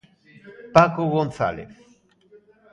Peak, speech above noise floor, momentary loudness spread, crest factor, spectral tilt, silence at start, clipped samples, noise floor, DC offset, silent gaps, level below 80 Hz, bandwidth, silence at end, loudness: 0 dBFS; 34 dB; 10 LU; 24 dB; -7 dB/octave; 0.45 s; under 0.1%; -55 dBFS; under 0.1%; none; -54 dBFS; 10.5 kHz; 1.05 s; -20 LUFS